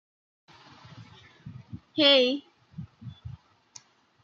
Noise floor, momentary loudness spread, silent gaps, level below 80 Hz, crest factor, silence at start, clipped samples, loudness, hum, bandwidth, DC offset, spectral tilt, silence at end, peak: -55 dBFS; 28 LU; none; -66 dBFS; 22 dB; 1 s; under 0.1%; -22 LUFS; none; 7.4 kHz; under 0.1%; -4.5 dB/octave; 0.95 s; -8 dBFS